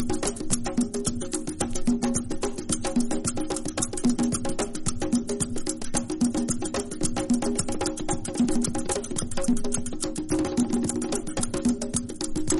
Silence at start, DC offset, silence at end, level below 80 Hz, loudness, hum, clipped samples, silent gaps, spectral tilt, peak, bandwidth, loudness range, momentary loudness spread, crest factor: 0 s; under 0.1%; 0 s; -38 dBFS; -27 LUFS; none; under 0.1%; none; -4 dB/octave; -8 dBFS; 11.5 kHz; 1 LU; 5 LU; 18 dB